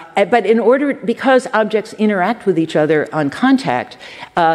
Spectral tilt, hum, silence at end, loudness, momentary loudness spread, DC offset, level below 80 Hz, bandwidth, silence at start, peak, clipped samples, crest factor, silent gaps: -6 dB/octave; none; 0 s; -15 LUFS; 7 LU; under 0.1%; -62 dBFS; 12 kHz; 0 s; -2 dBFS; under 0.1%; 14 dB; none